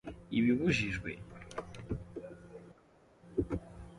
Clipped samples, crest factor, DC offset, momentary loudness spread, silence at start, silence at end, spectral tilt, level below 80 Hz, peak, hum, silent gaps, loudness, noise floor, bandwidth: under 0.1%; 18 dB; under 0.1%; 20 LU; 0.05 s; 0 s; -6 dB/octave; -52 dBFS; -18 dBFS; none; none; -35 LUFS; -64 dBFS; 11 kHz